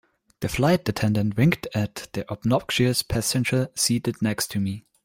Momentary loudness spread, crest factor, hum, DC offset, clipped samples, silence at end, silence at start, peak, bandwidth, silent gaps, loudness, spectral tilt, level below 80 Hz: 8 LU; 20 dB; none; under 0.1%; under 0.1%; 0.25 s; 0.4 s; -4 dBFS; 16.5 kHz; none; -24 LUFS; -5 dB/octave; -48 dBFS